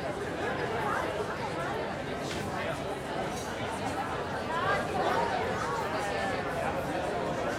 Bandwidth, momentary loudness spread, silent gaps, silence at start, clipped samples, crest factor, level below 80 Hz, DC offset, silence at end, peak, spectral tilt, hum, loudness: 16.5 kHz; 5 LU; none; 0 s; under 0.1%; 16 dB; -54 dBFS; under 0.1%; 0 s; -16 dBFS; -5 dB/octave; none; -32 LUFS